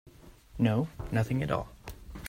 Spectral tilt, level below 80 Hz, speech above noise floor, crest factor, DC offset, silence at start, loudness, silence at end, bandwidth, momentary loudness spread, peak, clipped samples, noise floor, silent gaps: -7.5 dB/octave; -48 dBFS; 23 dB; 20 dB; under 0.1%; 0.05 s; -31 LUFS; 0 s; 16 kHz; 18 LU; -12 dBFS; under 0.1%; -52 dBFS; none